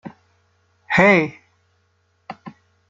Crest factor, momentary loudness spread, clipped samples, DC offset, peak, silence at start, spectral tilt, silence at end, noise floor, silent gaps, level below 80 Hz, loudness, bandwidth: 22 dB; 26 LU; under 0.1%; under 0.1%; -2 dBFS; 0.05 s; -6.5 dB/octave; 0.4 s; -65 dBFS; none; -56 dBFS; -16 LUFS; 7.8 kHz